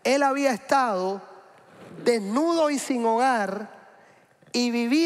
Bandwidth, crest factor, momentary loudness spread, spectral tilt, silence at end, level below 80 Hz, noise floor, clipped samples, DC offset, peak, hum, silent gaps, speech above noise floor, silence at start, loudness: 15 kHz; 16 dB; 9 LU; -4 dB/octave; 0 s; -74 dBFS; -56 dBFS; under 0.1%; under 0.1%; -8 dBFS; none; none; 33 dB; 0.05 s; -24 LUFS